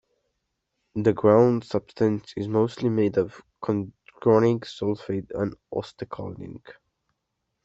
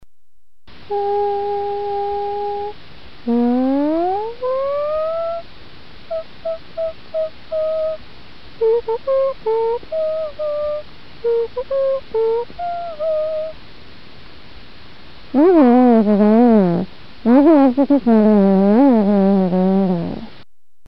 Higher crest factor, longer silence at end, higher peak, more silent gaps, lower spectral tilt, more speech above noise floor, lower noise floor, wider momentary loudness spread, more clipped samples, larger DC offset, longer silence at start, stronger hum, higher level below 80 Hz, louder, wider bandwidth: about the same, 22 dB vs 18 dB; first, 0.95 s vs 0.6 s; second, -4 dBFS vs 0 dBFS; neither; second, -8.5 dB/octave vs -10 dB/octave; about the same, 55 dB vs 52 dB; first, -79 dBFS vs -66 dBFS; first, 17 LU vs 14 LU; neither; second, under 0.1% vs 2%; first, 0.95 s vs 0 s; neither; second, -60 dBFS vs -50 dBFS; second, -24 LUFS vs -17 LUFS; first, 8 kHz vs 5.6 kHz